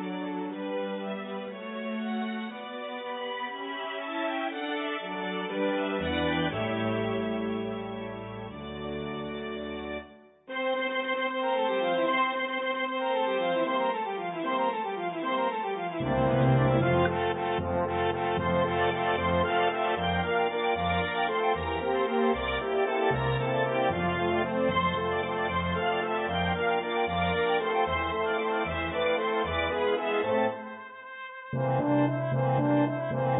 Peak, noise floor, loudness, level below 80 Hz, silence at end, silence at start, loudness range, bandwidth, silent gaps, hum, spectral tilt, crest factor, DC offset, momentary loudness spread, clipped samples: -12 dBFS; -50 dBFS; -29 LUFS; -50 dBFS; 0 s; 0 s; 7 LU; 4 kHz; none; none; -10 dB/octave; 16 dB; under 0.1%; 10 LU; under 0.1%